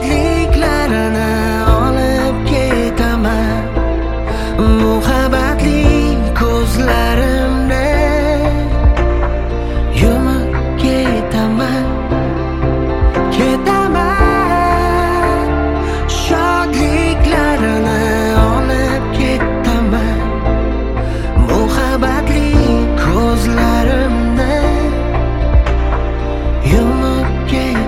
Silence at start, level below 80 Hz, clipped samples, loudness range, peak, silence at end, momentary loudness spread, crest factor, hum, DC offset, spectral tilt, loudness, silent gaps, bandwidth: 0 s; -16 dBFS; under 0.1%; 2 LU; 0 dBFS; 0 s; 5 LU; 12 dB; none; under 0.1%; -6.5 dB/octave; -14 LUFS; none; 15 kHz